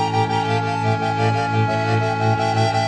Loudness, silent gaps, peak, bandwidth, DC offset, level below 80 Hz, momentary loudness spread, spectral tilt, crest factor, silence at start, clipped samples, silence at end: -19 LUFS; none; -4 dBFS; 9.4 kHz; under 0.1%; -52 dBFS; 2 LU; -6 dB/octave; 14 dB; 0 s; under 0.1%; 0 s